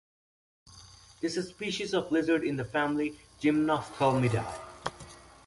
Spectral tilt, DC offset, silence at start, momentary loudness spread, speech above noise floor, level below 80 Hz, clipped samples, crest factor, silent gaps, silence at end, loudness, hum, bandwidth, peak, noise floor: -6 dB/octave; under 0.1%; 0.7 s; 13 LU; 24 dB; -60 dBFS; under 0.1%; 18 dB; none; 0.25 s; -30 LUFS; none; 11.5 kHz; -12 dBFS; -53 dBFS